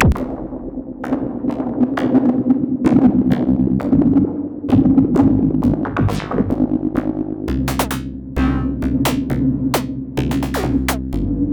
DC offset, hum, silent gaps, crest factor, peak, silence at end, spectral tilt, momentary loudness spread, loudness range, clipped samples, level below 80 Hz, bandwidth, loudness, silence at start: under 0.1%; none; none; 16 dB; 0 dBFS; 0 s; -7 dB/octave; 10 LU; 5 LU; under 0.1%; -30 dBFS; over 20 kHz; -18 LUFS; 0 s